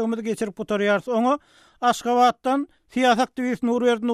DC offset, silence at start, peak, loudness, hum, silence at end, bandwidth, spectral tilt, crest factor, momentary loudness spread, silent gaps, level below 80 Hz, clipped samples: under 0.1%; 0 s; -6 dBFS; -22 LUFS; none; 0 s; 13.5 kHz; -4.5 dB/octave; 16 dB; 8 LU; none; -62 dBFS; under 0.1%